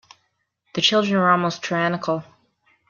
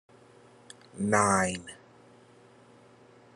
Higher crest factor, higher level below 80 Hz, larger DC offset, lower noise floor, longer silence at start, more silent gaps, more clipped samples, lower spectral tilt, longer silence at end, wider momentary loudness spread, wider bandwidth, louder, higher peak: second, 20 dB vs 26 dB; first, -66 dBFS vs -74 dBFS; neither; first, -71 dBFS vs -57 dBFS; second, 0.75 s vs 0.95 s; neither; neither; about the same, -4.5 dB/octave vs -4 dB/octave; second, 0.65 s vs 1.6 s; second, 10 LU vs 28 LU; second, 7.2 kHz vs 12 kHz; first, -20 LUFS vs -27 LUFS; first, -4 dBFS vs -8 dBFS